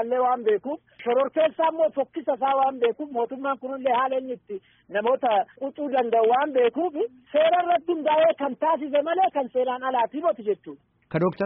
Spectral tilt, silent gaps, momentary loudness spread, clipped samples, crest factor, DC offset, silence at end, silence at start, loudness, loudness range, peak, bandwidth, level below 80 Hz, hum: -3.5 dB/octave; none; 10 LU; under 0.1%; 14 dB; under 0.1%; 0 s; 0 s; -24 LUFS; 3 LU; -10 dBFS; 4 kHz; -72 dBFS; none